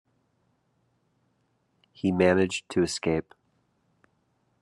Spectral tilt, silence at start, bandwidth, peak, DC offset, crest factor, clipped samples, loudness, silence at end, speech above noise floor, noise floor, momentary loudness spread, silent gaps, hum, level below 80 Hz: -5.5 dB/octave; 2.05 s; 12 kHz; -8 dBFS; under 0.1%; 22 dB; under 0.1%; -26 LUFS; 1.4 s; 47 dB; -72 dBFS; 8 LU; none; none; -64 dBFS